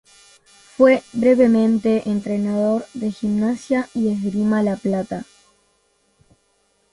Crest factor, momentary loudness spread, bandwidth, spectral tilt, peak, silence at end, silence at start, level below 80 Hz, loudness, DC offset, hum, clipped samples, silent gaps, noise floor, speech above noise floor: 18 dB; 10 LU; 11.5 kHz; -7.5 dB/octave; -2 dBFS; 1.7 s; 0.8 s; -58 dBFS; -19 LUFS; under 0.1%; none; under 0.1%; none; -64 dBFS; 45 dB